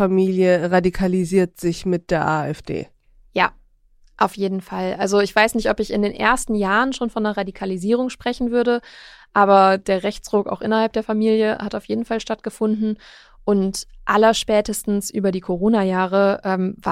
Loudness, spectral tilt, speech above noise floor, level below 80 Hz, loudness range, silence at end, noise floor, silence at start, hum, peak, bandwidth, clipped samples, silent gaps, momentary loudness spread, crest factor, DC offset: -20 LUFS; -5.5 dB/octave; 35 dB; -44 dBFS; 4 LU; 0 s; -54 dBFS; 0 s; none; -2 dBFS; 15.5 kHz; under 0.1%; none; 9 LU; 18 dB; under 0.1%